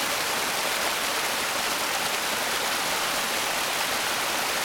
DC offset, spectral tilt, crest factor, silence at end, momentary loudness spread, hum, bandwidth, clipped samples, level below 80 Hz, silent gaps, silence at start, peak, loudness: under 0.1%; 0 dB/octave; 14 dB; 0 s; 0 LU; none; over 20 kHz; under 0.1%; -60 dBFS; none; 0 s; -12 dBFS; -25 LUFS